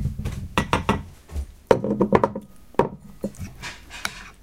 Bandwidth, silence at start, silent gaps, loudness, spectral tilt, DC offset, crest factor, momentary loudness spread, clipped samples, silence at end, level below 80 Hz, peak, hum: 16.5 kHz; 0 s; none; -25 LUFS; -6 dB/octave; 0.2%; 26 dB; 15 LU; under 0.1%; 0.1 s; -38 dBFS; 0 dBFS; none